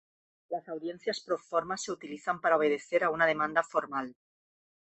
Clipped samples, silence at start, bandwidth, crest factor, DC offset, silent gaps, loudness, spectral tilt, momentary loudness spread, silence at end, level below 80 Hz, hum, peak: under 0.1%; 0.5 s; 8.6 kHz; 20 dB; under 0.1%; none; -31 LUFS; -3.5 dB/octave; 12 LU; 0.85 s; -74 dBFS; none; -12 dBFS